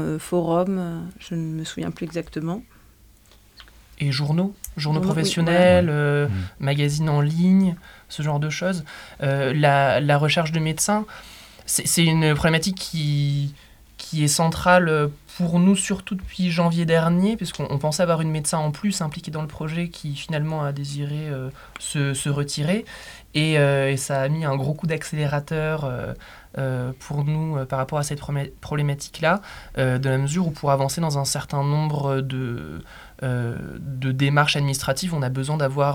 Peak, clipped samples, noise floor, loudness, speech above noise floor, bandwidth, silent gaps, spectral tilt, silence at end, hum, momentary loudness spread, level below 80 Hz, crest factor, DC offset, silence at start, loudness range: -2 dBFS; under 0.1%; -52 dBFS; -22 LUFS; 30 dB; 17 kHz; none; -5 dB/octave; 0 s; none; 12 LU; -48 dBFS; 20 dB; under 0.1%; 0 s; 7 LU